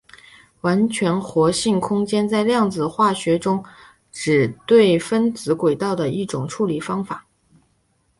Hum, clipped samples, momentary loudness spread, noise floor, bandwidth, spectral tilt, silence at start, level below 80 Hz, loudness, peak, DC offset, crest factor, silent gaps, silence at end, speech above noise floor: none; under 0.1%; 10 LU; -64 dBFS; 11.5 kHz; -5.5 dB/octave; 0.65 s; -56 dBFS; -20 LUFS; -2 dBFS; under 0.1%; 18 dB; none; 1 s; 46 dB